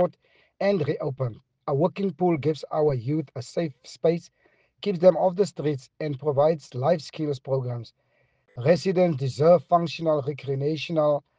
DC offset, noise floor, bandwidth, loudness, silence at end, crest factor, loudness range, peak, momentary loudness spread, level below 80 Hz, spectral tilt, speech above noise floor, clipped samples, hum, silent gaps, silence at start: under 0.1%; -66 dBFS; 9.2 kHz; -25 LUFS; 0.2 s; 20 dB; 3 LU; -6 dBFS; 12 LU; -66 dBFS; -7.5 dB/octave; 42 dB; under 0.1%; none; none; 0 s